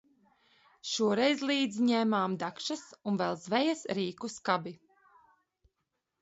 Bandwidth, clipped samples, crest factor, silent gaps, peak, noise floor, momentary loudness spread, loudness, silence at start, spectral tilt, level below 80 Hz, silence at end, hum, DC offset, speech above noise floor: 8.2 kHz; under 0.1%; 20 dB; none; -14 dBFS; -84 dBFS; 10 LU; -31 LUFS; 0.85 s; -4.5 dB/octave; -76 dBFS; 1.45 s; none; under 0.1%; 53 dB